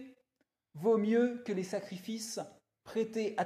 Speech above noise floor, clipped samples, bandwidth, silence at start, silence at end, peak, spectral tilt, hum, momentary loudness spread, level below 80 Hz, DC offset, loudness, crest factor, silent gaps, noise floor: 49 dB; under 0.1%; 14.5 kHz; 0 s; 0 s; -20 dBFS; -5.5 dB/octave; none; 12 LU; -80 dBFS; under 0.1%; -34 LUFS; 16 dB; none; -82 dBFS